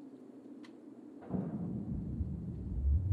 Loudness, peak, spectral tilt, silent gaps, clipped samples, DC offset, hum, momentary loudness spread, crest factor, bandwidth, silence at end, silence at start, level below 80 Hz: -39 LUFS; -22 dBFS; -11 dB/octave; none; under 0.1%; under 0.1%; none; 17 LU; 16 dB; 4.6 kHz; 0 s; 0 s; -42 dBFS